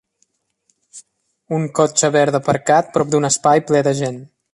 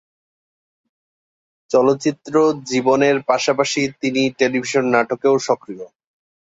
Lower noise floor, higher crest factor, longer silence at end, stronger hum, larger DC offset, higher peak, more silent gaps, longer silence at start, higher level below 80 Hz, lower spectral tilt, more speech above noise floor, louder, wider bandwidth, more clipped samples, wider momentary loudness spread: second, -66 dBFS vs under -90 dBFS; about the same, 18 dB vs 18 dB; second, 0.3 s vs 0.7 s; neither; neither; about the same, 0 dBFS vs -2 dBFS; neither; second, 0.95 s vs 1.7 s; about the same, -60 dBFS vs -64 dBFS; about the same, -4.5 dB/octave vs -4.5 dB/octave; second, 50 dB vs over 73 dB; about the same, -16 LUFS vs -18 LUFS; first, 11.5 kHz vs 8 kHz; neither; first, 9 LU vs 5 LU